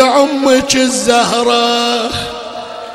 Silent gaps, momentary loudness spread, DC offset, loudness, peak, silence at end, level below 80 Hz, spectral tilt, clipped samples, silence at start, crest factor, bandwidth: none; 13 LU; under 0.1%; -12 LUFS; 0 dBFS; 0 s; -42 dBFS; -2.5 dB/octave; under 0.1%; 0 s; 12 dB; 16.5 kHz